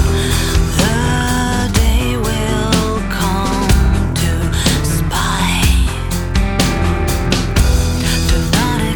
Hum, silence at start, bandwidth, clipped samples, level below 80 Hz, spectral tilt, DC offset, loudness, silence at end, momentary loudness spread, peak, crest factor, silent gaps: none; 0 s; over 20 kHz; under 0.1%; -18 dBFS; -4.5 dB/octave; under 0.1%; -15 LUFS; 0 s; 3 LU; 0 dBFS; 14 dB; none